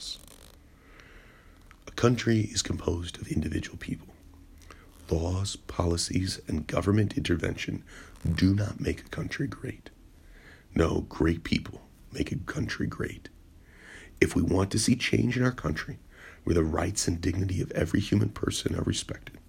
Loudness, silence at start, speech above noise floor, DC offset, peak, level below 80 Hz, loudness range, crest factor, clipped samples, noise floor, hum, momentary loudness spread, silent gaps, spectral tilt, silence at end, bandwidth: -29 LUFS; 0 s; 25 dB; under 0.1%; -6 dBFS; -46 dBFS; 4 LU; 24 dB; under 0.1%; -54 dBFS; none; 15 LU; none; -5.5 dB/octave; 0.1 s; 16 kHz